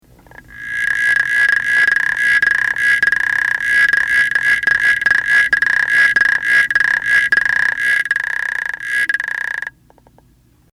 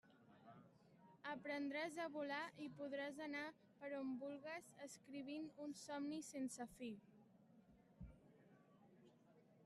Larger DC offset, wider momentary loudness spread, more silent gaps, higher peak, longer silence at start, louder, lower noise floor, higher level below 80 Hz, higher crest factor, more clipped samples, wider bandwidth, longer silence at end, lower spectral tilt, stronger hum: neither; second, 8 LU vs 16 LU; neither; first, -4 dBFS vs -36 dBFS; first, 0.5 s vs 0.05 s; first, -13 LUFS vs -50 LUFS; second, -52 dBFS vs -72 dBFS; first, -50 dBFS vs -80 dBFS; about the same, 12 dB vs 16 dB; neither; first, 16 kHz vs 13 kHz; first, 1.05 s vs 0 s; second, -0.5 dB/octave vs -4 dB/octave; neither